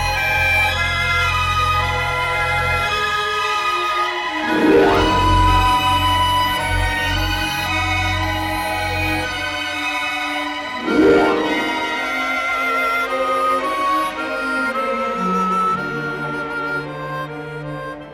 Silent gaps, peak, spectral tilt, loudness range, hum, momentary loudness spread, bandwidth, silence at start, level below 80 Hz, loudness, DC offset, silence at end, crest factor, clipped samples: none; -4 dBFS; -4.5 dB/octave; 5 LU; none; 9 LU; 18 kHz; 0 s; -32 dBFS; -18 LUFS; under 0.1%; 0 s; 14 dB; under 0.1%